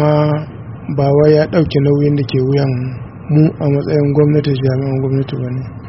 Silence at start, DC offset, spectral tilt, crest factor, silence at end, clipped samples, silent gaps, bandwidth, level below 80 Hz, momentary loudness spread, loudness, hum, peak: 0 s; 0.2%; -8 dB/octave; 14 dB; 0 s; under 0.1%; none; 5.8 kHz; -42 dBFS; 11 LU; -14 LUFS; none; 0 dBFS